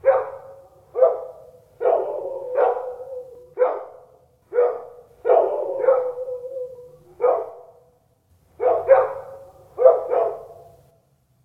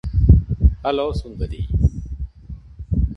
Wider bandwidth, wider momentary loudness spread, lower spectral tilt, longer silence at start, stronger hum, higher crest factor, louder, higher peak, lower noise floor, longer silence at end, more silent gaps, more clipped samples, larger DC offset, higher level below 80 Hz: second, 3.8 kHz vs 6 kHz; about the same, 20 LU vs 20 LU; second, -7 dB/octave vs -9.5 dB/octave; about the same, 0.05 s vs 0.05 s; neither; about the same, 22 dB vs 18 dB; about the same, -21 LUFS vs -20 LUFS; about the same, 0 dBFS vs 0 dBFS; first, -62 dBFS vs -37 dBFS; first, 0.9 s vs 0 s; neither; neither; neither; second, -66 dBFS vs -22 dBFS